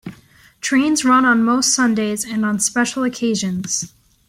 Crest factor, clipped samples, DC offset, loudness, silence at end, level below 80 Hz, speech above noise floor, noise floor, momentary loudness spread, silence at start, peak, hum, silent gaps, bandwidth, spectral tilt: 14 dB; under 0.1%; under 0.1%; -17 LUFS; 0.4 s; -56 dBFS; 32 dB; -49 dBFS; 9 LU; 0.05 s; -4 dBFS; none; none; 16 kHz; -3 dB/octave